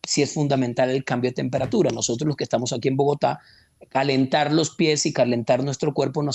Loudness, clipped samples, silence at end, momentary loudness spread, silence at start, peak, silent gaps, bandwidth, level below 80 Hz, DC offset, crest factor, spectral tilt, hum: -22 LUFS; under 0.1%; 0 s; 4 LU; 0.05 s; -8 dBFS; none; 8.8 kHz; -60 dBFS; under 0.1%; 14 dB; -5 dB/octave; none